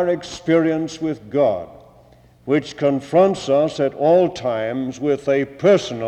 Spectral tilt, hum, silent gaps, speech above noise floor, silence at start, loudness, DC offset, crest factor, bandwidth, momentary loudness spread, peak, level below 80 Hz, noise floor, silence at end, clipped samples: -6 dB/octave; none; none; 31 dB; 0 s; -19 LUFS; under 0.1%; 14 dB; 9.2 kHz; 8 LU; -4 dBFS; -56 dBFS; -49 dBFS; 0 s; under 0.1%